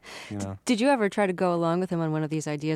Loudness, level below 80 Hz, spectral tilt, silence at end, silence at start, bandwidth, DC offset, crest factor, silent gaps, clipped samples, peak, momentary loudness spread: -26 LUFS; -68 dBFS; -6 dB/octave; 0 s; 0.05 s; 13 kHz; under 0.1%; 14 dB; none; under 0.1%; -12 dBFS; 11 LU